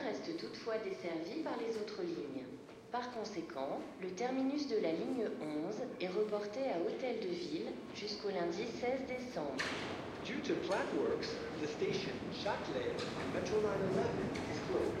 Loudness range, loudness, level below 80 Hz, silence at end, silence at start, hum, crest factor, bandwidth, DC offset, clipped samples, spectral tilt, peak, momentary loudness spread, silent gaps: 4 LU; -39 LUFS; -68 dBFS; 0 s; 0 s; none; 16 dB; 13 kHz; under 0.1%; under 0.1%; -5.5 dB/octave; -24 dBFS; 7 LU; none